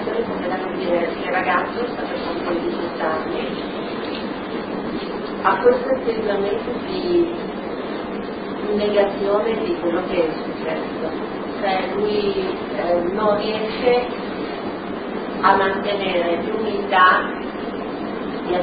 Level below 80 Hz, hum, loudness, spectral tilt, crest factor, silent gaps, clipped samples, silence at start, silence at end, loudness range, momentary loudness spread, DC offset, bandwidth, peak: -50 dBFS; none; -21 LUFS; -10 dB/octave; 20 dB; none; under 0.1%; 0 s; 0 s; 4 LU; 10 LU; under 0.1%; 5 kHz; -2 dBFS